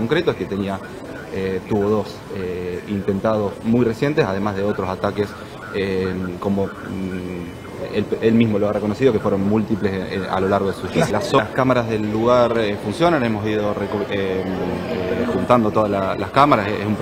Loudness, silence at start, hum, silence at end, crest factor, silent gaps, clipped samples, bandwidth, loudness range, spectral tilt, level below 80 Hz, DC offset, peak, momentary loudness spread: -20 LUFS; 0 s; none; 0 s; 20 dB; none; under 0.1%; 16 kHz; 5 LU; -7 dB/octave; -48 dBFS; under 0.1%; 0 dBFS; 10 LU